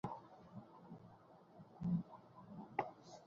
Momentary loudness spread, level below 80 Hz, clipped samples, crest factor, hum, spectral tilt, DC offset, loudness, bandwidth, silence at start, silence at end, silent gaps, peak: 20 LU; -76 dBFS; under 0.1%; 28 dB; none; -8 dB/octave; under 0.1%; -47 LUFS; 7.2 kHz; 0.05 s; 0 s; none; -22 dBFS